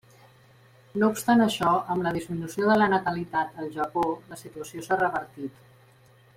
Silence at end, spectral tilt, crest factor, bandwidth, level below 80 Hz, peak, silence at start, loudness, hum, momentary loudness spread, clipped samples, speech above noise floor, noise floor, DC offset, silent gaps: 0.85 s; -5.5 dB/octave; 18 dB; 16 kHz; -62 dBFS; -10 dBFS; 0.95 s; -26 LUFS; none; 17 LU; under 0.1%; 31 dB; -57 dBFS; under 0.1%; none